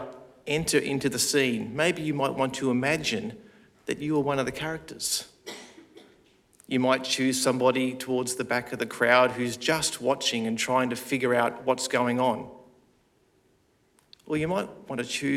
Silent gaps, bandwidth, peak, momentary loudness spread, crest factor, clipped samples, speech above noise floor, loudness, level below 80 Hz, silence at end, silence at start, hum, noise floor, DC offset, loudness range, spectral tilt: none; 16.5 kHz; -4 dBFS; 11 LU; 24 dB; under 0.1%; 39 dB; -26 LUFS; -62 dBFS; 0 s; 0 s; none; -66 dBFS; under 0.1%; 6 LU; -3.5 dB/octave